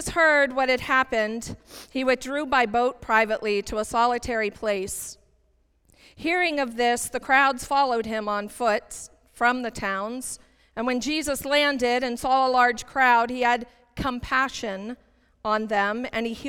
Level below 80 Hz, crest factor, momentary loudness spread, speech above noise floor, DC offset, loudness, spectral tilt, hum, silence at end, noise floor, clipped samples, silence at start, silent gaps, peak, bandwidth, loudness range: -50 dBFS; 18 dB; 14 LU; 41 dB; under 0.1%; -24 LUFS; -3 dB/octave; none; 0 s; -65 dBFS; under 0.1%; 0 s; none; -6 dBFS; 18 kHz; 5 LU